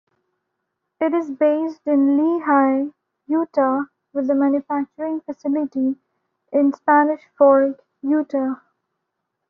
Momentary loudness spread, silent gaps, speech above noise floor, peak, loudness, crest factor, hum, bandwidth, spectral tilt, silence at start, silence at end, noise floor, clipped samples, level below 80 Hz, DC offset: 10 LU; none; 59 dB; -4 dBFS; -20 LUFS; 16 dB; none; 5 kHz; -5 dB/octave; 1 s; 0.95 s; -78 dBFS; under 0.1%; -70 dBFS; under 0.1%